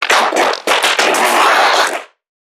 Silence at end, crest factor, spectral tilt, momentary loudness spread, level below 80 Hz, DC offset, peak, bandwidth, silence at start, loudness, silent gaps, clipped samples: 0.45 s; 14 dB; 0 dB/octave; 5 LU; -70 dBFS; under 0.1%; 0 dBFS; 19.5 kHz; 0 s; -11 LUFS; none; under 0.1%